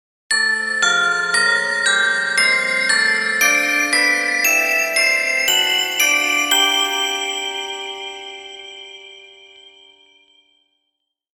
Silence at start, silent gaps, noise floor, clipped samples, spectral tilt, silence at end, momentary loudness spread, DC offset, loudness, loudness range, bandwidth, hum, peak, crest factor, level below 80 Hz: 0.3 s; none; -76 dBFS; under 0.1%; 1 dB/octave; 2.15 s; 15 LU; under 0.1%; -15 LUFS; 14 LU; 18 kHz; none; -2 dBFS; 18 dB; -64 dBFS